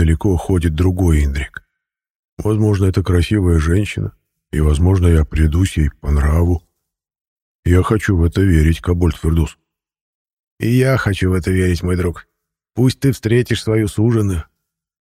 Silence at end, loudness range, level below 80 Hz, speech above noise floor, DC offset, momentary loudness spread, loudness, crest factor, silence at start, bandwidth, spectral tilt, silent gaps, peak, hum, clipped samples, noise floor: 0.6 s; 2 LU; -24 dBFS; 63 dB; under 0.1%; 9 LU; -16 LUFS; 16 dB; 0 s; 14.5 kHz; -7 dB/octave; 2.10-2.37 s, 7.21-7.63 s, 10.01-10.25 s, 10.33-10.57 s; 0 dBFS; none; under 0.1%; -78 dBFS